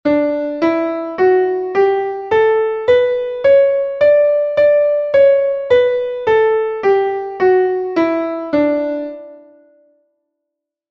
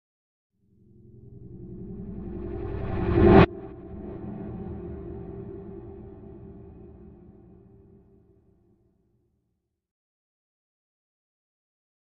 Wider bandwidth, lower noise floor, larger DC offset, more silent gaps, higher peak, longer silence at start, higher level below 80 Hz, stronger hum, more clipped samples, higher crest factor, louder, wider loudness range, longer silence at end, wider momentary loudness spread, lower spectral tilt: first, 6.2 kHz vs 5.6 kHz; about the same, -79 dBFS vs -79 dBFS; neither; neither; about the same, -2 dBFS vs -2 dBFS; second, 0.05 s vs 1.15 s; second, -54 dBFS vs -40 dBFS; neither; neither; second, 12 dB vs 28 dB; first, -14 LUFS vs -25 LUFS; second, 5 LU vs 20 LU; second, 1.5 s vs 4.8 s; second, 7 LU vs 28 LU; about the same, -6.5 dB/octave vs -7.5 dB/octave